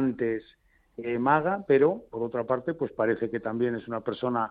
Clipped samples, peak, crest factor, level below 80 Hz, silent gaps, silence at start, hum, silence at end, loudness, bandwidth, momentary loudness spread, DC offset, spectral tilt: under 0.1%; -8 dBFS; 18 dB; -64 dBFS; none; 0 s; none; 0 s; -28 LUFS; 4.8 kHz; 10 LU; under 0.1%; -10 dB/octave